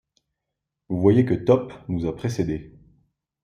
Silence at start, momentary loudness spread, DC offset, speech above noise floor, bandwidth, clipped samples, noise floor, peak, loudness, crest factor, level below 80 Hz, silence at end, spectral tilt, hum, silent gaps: 0.9 s; 12 LU; under 0.1%; 61 dB; 11.5 kHz; under 0.1%; -83 dBFS; -4 dBFS; -23 LUFS; 20 dB; -50 dBFS; 0.75 s; -8.5 dB/octave; none; none